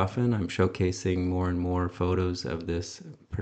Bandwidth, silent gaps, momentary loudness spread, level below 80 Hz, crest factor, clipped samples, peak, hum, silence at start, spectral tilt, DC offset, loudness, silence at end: 8.6 kHz; none; 7 LU; -48 dBFS; 18 dB; under 0.1%; -10 dBFS; none; 0 s; -6.5 dB/octave; under 0.1%; -29 LUFS; 0 s